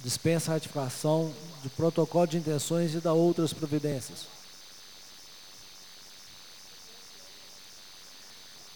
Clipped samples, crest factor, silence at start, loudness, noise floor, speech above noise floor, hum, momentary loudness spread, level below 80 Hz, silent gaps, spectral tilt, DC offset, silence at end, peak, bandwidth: under 0.1%; 18 dB; 0 s; -29 LUFS; -50 dBFS; 22 dB; none; 20 LU; -68 dBFS; none; -5.5 dB/octave; 0.2%; 0 s; -12 dBFS; over 20 kHz